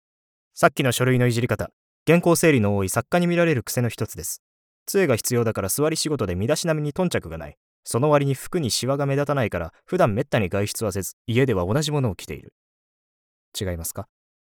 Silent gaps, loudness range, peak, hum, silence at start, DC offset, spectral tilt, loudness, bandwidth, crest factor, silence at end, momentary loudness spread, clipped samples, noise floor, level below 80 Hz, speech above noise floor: 1.73-2.06 s, 4.39-4.86 s, 7.57-7.83 s, 11.13-11.25 s, 12.52-13.52 s; 5 LU; -2 dBFS; none; 0.55 s; under 0.1%; -5 dB/octave; -22 LUFS; 20 kHz; 20 dB; 0.55 s; 12 LU; under 0.1%; under -90 dBFS; -50 dBFS; over 68 dB